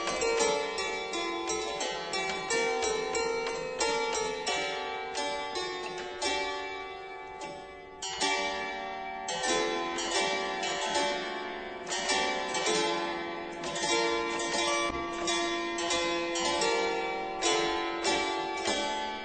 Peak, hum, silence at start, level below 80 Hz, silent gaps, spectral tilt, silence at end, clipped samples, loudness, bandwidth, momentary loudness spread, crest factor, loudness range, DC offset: -14 dBFS; none; 0 s; -58 dBFS; none; -1.5 dB/octave; 0 s; under 0.1%; -31 LUFS; 9.2 kHz; 9 LU; 16 dB; 4 LU; under 0.1%